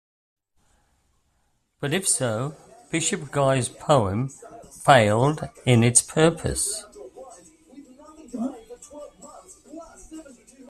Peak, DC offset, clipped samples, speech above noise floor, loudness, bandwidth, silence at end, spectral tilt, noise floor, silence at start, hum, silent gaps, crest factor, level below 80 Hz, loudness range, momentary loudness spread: 0 dBFS; under 0.1%; under 0.1%; 48 dB; -22 LUFS; 13.5 kHz; 0.4 s; -4 dB/octave; -69 dBFS; 1.8 s; none; none; 24 dB; -52 dBFS; 19 LU; 26 LU